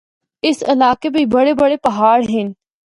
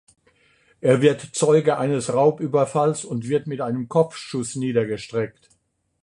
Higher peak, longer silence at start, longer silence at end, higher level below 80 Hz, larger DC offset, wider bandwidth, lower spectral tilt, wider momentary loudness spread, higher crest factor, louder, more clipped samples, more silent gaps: about the same, 0 dBFS vs -2 dBFS; second, 0.45 s vs 0.85 s; second, 0.35 s vs 0.7 s; first, -52 dBFS vs -62 dBFS; neither; about the same, 11.5 kHz vs 11 kHz; about the same, -5.5 dB/octave vs -6 dB/octave; second, 7 LU vs 10 LU; second, 14 dB vs 20 dB; first, -15 LUFS vs -22 LUFS; neither; neither